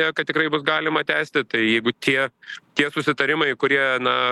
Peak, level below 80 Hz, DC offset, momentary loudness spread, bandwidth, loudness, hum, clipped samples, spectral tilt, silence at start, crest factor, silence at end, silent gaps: 0 dBFS; -68 dBFS; under 0.1%; 3 LU; 12.5 kHz; -20 LUFS; none; under 0.1%; -4.5 dB/octave; 0 s; 20 dB; 0 s; none